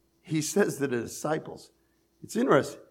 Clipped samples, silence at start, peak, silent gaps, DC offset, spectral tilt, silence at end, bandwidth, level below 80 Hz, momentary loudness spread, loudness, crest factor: under 0.1%; 0.25 s; -8 dBFS; none; under 0.1%; -5 dB/octave; 0.1 s; 16.5 kHz; -72 dBFS; 11 LU; -28 LUFS; 20 dB